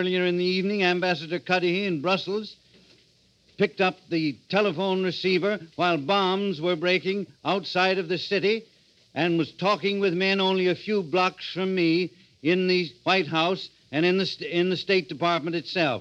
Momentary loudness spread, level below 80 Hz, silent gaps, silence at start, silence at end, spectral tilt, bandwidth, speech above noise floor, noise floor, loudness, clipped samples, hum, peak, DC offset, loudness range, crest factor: 5 LU; -72 dBFS; none; 0 s; 0 s; -6 dB/octave; 8 kHz; 37 dB; -62 dBFS; -25 LUFS; under 0.1%; none; -6 dBFS; under 0.1%; 3 LU; 20 dB